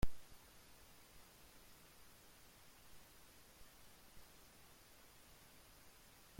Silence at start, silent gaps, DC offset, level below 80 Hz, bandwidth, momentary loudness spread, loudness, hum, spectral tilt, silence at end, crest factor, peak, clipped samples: 0 s; none; under 0.1%; -58 dBFS; 16.5 kHz; 0 LU; -62 LUFS; none; -4 dB/octave; 0 s; 24 dB; -24 dBFS; under 0.1%